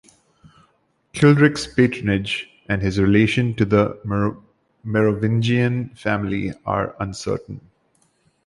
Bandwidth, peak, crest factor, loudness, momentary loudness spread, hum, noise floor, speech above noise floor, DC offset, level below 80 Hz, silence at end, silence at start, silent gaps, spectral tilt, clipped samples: 11.5 kHz; -2 dBFS; 18 dB; -20 LUFS; 11 LU; none; -64 dBFS; 45 dB; under 0.1%; -44 dBFS; 0.85 s; 1.15 s; none; -7 dB/octave; under 0.1%